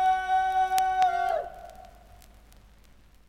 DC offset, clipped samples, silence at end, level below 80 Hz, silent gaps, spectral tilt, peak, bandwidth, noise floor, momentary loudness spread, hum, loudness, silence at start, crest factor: under 0.1%; under 0.1%; 1.4 s; -54 dBFS; none; -2 dB/octave; -4 dBFS; 16.5 kHz; -55 dBFS; 19 LU; none; -26 LUFS; 0 s; 26 dB